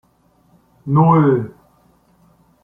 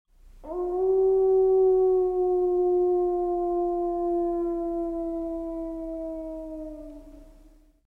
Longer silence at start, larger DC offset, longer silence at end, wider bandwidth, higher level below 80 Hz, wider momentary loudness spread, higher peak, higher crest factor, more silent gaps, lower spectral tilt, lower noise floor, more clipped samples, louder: first, 0.85 s vs 0.25 s; neither; first, 1.15 s vs 0.55 s; first, 3.6 kHz vs 1.8 kHz; second, -56 dBFS vs -48 dBFS; first, 21 LU vs 16 LU; first, -2 dBFS vs -14 dBFS; first, 16 dB vs 10 dB; neither; first, -11.5 dB/octave vs -9.5 dB/octave; about the same, -57 dBFS vs -55 dBFS; neither; first, -15 LUFS vs -25 LUFS